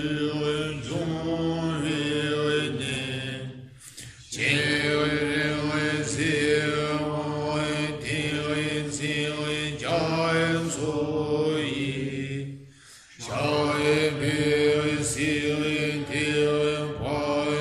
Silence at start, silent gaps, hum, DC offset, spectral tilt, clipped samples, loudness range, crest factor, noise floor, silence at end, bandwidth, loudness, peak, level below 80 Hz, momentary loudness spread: 0 s; none; none; under 0.1%; -4.5 dB/octave; under 0.1%; 3 LU; 18 dB; -50 dBFS; 0 s; 13 kHz; -26 LUFS; -8 dBFS; -52 dBFS; 8 LU